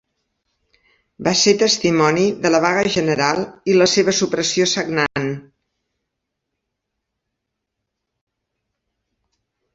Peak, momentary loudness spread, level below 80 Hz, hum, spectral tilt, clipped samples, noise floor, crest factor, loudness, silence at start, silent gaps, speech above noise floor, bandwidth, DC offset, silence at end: 0 dBFS; 8 LU; -58 dBFS; none; -3.5 dB/octave; under 0.1%; -79 dBFS; 20 dB; -17 LUFS; 1.2 s; none; 62 dB; 8 kHz; under 0.1%; 4.35 s